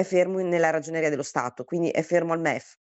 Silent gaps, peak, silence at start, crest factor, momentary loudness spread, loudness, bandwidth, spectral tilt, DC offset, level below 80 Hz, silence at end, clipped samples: none; -8 dBFS; 0 s; 18 dB; 6 LU; -25 LUFS; 8.4 kHz; -5.5 dB/octave; under 0.1%; -74 dBFS; 0.3 s; under 0.1%